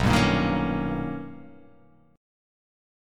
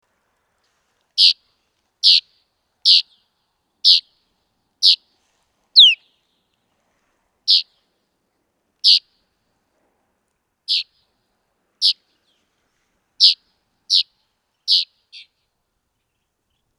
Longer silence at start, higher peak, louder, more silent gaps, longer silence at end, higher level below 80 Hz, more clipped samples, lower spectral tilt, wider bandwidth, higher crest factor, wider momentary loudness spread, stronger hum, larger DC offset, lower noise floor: second, 0 s vs 1.15 s; second, -8 dBFS vs 0 dBFS; second, -25 LUFS vs -14 LUFS; neither; second, 0.95 s vs 1.95 s; first, -40 dBFS vs -82 dBFS; neither; first, -6 dB/octave vs 6 dB/octave; about the same, 16.5 kHz vs 17.5 kHz; about the same, 20 dB vs 22 dB; first, 20 LU vs 16 LU; neither; neither; second, -57 dBFS vs -73 dBFS